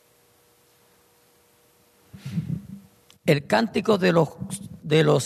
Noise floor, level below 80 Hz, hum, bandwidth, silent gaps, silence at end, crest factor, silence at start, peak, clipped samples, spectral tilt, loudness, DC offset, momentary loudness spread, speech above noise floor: -60 dBFS; -60 dBFS; none; 13.5 kHz; none; 0 s; 20 dB; 2.15 s; -6 dBFS; under 0.1%; -6 dB/octave; -24 LUFS; under 0.1%; 17 LU; 39 dB